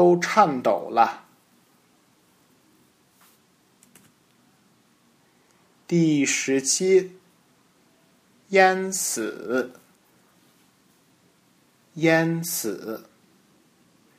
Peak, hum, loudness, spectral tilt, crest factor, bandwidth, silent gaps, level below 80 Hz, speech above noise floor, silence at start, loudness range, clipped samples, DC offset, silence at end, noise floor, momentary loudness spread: -2 dBFS; none; -22 LUFS; -4 dB/octave; 24 dB; 15.5 kHz; none; -76 dBFS; 40 dB; 0 s; 8 LU; under 0.1%; under 0.1%; 1.2 s; -61 dBFS; 17 LU